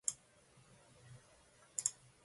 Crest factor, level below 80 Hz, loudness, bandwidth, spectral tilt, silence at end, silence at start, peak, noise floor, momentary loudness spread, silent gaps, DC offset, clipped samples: 32 dB; -80 dBFS; -41 LUFS; 11.5 kHz; 0 dB/octave; 0.35 s; 0.05 s; -18 dBFS; -67 dBFS; 26 LU; none; under 0.1%; under 0.1%